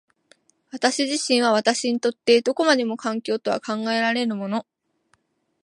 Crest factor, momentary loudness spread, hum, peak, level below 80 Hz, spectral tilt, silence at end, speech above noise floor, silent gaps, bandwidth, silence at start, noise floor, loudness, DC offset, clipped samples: 20 dB; 8 LU; none; -4 dBFS; -76 dBFS; -3 dB/octave; 1 s; 45 dB; none; 11.5 kHz; 0.75 s; -67 dBFS; -22 LUFS; under 0.1%; under 0.1%